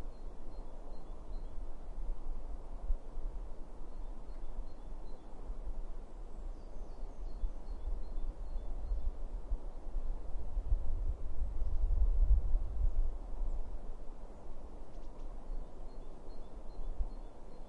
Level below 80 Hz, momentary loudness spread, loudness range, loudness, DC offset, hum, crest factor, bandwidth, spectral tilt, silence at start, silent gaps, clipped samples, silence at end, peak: -38 dBFS; 14 LU; 12 LU; -45 LUFS; under 0.1%; none; 18 dB; 2.1 kHz; -8 dB/octave; 0 s; none; under 0.1%; 0 s; -18 dBFS